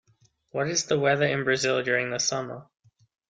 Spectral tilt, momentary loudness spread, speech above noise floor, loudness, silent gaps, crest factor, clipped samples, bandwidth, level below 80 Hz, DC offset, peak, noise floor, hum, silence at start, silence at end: -3 dB/octave; 12 LU; 39 dB; -25 LUFS; none; 18 dB; under 0.1%; 9.4 kHz; -66 dBFS; under 0.1%; -10 dBFS; -65 dBFS; none; 0.55 s; 0.65 s